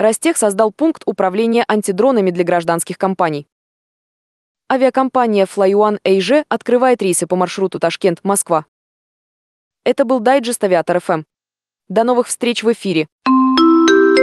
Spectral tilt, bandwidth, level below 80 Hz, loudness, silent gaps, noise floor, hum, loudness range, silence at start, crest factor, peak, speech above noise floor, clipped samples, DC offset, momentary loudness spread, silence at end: -4.5 dB/octave; 12.5 kHz; -62 dBFS; -15 LUFS; 3.52-4.55 s, 8.68-9.71 s, 13.12-13.19 s; -89 dBFS; none; 3 LU; 0 s; 14 dB; -2 dBFS; 75 dB; under 0.1%; under 0.1%; 7 LU; 0 s